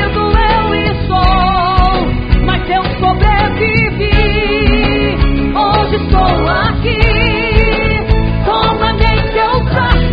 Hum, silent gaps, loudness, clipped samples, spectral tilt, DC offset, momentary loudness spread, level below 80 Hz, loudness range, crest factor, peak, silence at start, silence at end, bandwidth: none; none; -12 LUFS; 0.2%; -8.5 dB/octave; under 0.1%; 3 LU; -16 dBFS; 0 LU; 10 dB; 0 dBFS; 0 s; 0 s; 5.2 kHz